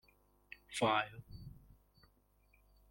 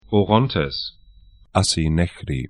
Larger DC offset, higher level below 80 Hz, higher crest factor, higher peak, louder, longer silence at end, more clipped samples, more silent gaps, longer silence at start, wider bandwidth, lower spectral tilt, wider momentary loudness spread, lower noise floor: neither; second, -66 dBFS vs -36 dBFS; about the same, 22 dB vs 22 dB; second, -20 dBFS vs 0 dBFS; second, -37 LUFS vs -20 LUFS; first, 1.4 s vs 0 s; neither; neither; first, 0.7 s vs 0.1 s; first, 16.5 kHz vs 11.5 kHz; about the same, -4 dB/octave vs -5 dB/octave; first, 23 LU vs 9 LU; first, -72 dBFS vs -49 dBFS